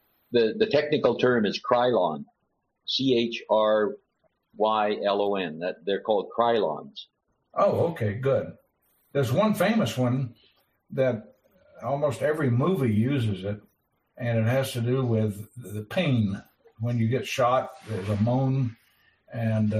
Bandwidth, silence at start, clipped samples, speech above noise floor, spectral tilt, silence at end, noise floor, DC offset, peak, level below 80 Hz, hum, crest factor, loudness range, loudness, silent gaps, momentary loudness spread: 15 kHz; 0.3 s; under 0.1%; 51 dB; -7 dB/octave; 0 s; -76 dBFS; under 0.1%; -6 dBFS; -64 dBFS; none; 20 dB; 3 LU; -26 LUFS; none; 12 LU